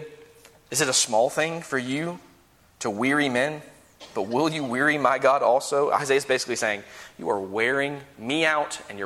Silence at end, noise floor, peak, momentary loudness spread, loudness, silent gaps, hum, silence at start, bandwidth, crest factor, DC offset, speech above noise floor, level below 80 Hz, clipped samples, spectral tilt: 0 s; -57 dBFS; -6 dBFS; 13 LU; -24 LUFS; none; none; 0 s; 16 kHz; 20 dB; under 0.1%; 33 dB; -66 dBFS; under 0.1%; -3 dB/octave